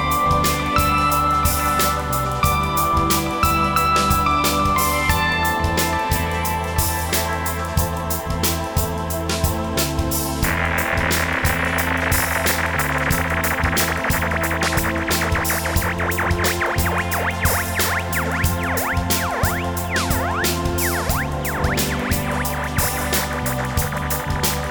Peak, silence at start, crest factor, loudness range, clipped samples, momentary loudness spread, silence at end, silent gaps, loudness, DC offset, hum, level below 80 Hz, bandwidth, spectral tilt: -4 dBFS; 0 s; 16 dB; 3 LU; under 0.1%; 5 LU; 0 s; none; -19 LUFS; under 0.1%; none; -30 dBFS; over 20 kHz; -4 dB/octave